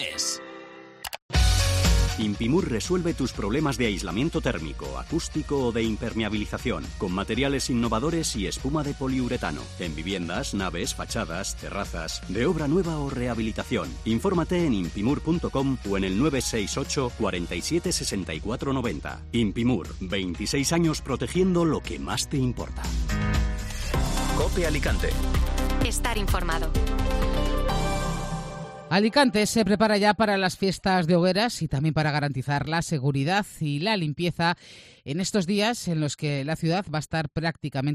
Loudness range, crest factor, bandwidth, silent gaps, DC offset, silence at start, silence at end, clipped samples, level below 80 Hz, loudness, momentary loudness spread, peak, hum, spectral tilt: 5 LU; 18 dB; 14 kHz; 1.22-1.29 s; under 0.1%; 0 s; 0 s; under 0.1%; -32 dBFS; -26 LUFS; 8 LU; -8 dBFS; none; -5 dB/octave